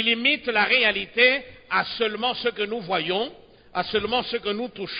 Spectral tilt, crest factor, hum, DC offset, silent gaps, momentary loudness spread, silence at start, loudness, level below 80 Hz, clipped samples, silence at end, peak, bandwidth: -8 dB/octave; 18 dB; none; under 0.1%; none; 10 LU; 0 s; -23 LUFS; -58 dBFS; under 0.1%; 0 s; -6 dBFS; 5.2 kHz